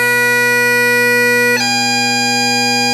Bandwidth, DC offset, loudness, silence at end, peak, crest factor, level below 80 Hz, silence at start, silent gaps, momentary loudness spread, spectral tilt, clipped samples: 16 kHz; under 0.1%; -11 LUFS; 0 s; -2 dBFS; 12 dB; -62 dBFS; 0 s; none; 2 LU; -2 dB/octave; under 0.1%